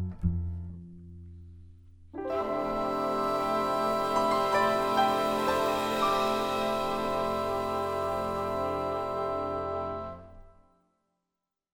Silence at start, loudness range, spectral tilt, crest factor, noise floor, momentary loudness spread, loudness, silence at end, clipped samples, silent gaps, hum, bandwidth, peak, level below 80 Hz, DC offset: 0 s; 7 LU; -5.5 dB/octave; 16 dB; -87 dBFS; 17 LU; -29 LUFS; 1.25 s; under 0.1%; none; none; 19.5 kHz; -14 dBFS; -50 dBFS; under 0.1%